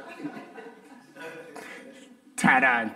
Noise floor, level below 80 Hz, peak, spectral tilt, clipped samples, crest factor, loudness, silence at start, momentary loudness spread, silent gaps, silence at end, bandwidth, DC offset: -50 dBFS; -70 dBFS; -6 dBFS; -4 dB/octave; under 0.1%; 24 dB; -21 LUFS; 0 s; 25 LU; none; 0 s; 16 kHz; under 0.1%